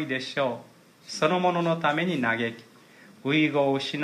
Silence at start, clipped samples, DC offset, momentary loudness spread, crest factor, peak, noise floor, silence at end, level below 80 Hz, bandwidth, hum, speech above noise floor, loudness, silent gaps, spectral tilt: 0 s; under 0.1%; under 0.1%; 12 LU; 18 dB; -8 dBFS; -52 dBFS; 0 s; -76 dBFS; 14 kHz; none; 27 dB; -26 LUFS; none; -5.5 dB/octave